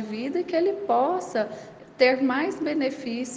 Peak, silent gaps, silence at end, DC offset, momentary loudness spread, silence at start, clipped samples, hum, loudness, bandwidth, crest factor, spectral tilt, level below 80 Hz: -6 dBFS; none; 0 s; under 0.1%; 10 LU; 0 s; under 0.1%; none; -25 LUFS; 9.4 kHz; 20 dB; -4.5 dB/octave; -70 dBFS